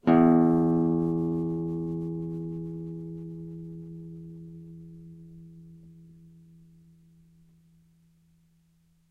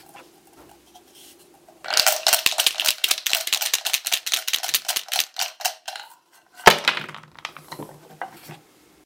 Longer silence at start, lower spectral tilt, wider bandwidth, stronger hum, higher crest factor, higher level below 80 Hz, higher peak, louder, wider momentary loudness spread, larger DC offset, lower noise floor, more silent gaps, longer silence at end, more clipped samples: about the same, 0.05 s vs 0.15 s; first, -10.5 dB/octave vs 0.5 dB/octave; second, 4.4 kHz vs 17 kHz; neither; second, 20 dB vs 26 dB; about the same, -60 dBFS vs -60 dBFS; second, -10 dBFS vs 0 dBFS; second, -27 LUFS vs -20 LUFS; first, 27 LU vs 21 LU; neither; first, -65 dBFS vs -53 dBFS; neither; first, 3.05 s vs 0.5 s; neither